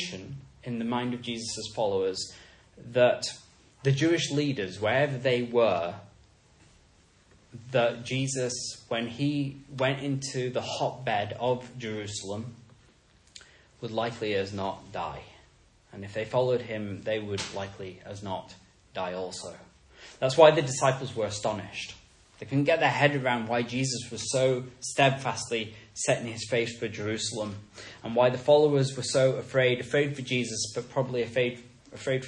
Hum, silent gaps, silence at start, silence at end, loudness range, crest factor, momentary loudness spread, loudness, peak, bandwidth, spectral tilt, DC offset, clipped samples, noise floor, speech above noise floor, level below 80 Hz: none; none; 0 s; 0 s; 9 LU; 26 dB; 14 LU; -28 LUFS; -4 dBFS; 10.5 kHz; -4.5 dB/octave; under 0.1%; under 0.1%; -61 dBFS; 33 dB; -64 dBFS